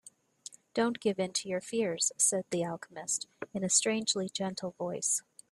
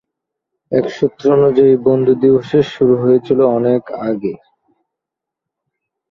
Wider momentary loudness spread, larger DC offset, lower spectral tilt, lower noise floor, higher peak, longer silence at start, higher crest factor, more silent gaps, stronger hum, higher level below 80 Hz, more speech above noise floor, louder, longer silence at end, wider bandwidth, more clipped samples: about the same, 11 LU vs 9 LU; neither; second, -2.5 dB/octave vs -8.5 dB/octave; second, -53 dBFS vs -83 dBFS; second, -12 dBFS vs -2 dBFS; about the same, 0.75 s vs 0.7 s; first, 20 dB vs 14 dB; neither; neither; second, -76 dBFS vs -54 dBFS; second, 21 dB vs 70 dB; second, -31 LUFS vs -14 LUFS; second, 0.3 s vs 1.75 s; first, 15 kHz vs 6.8 kHz; neither